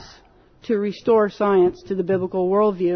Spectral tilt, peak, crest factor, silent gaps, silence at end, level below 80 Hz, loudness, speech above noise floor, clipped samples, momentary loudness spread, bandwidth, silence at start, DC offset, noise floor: -8 dB/octave; -8 dBFS; 12 dB; none; 0 s; -56 dBFS; -20 LUFS; 33 dB; under 0.1%; 7 LU; 6.4 kHz; 0 s; under 0.1%; -52 dBFS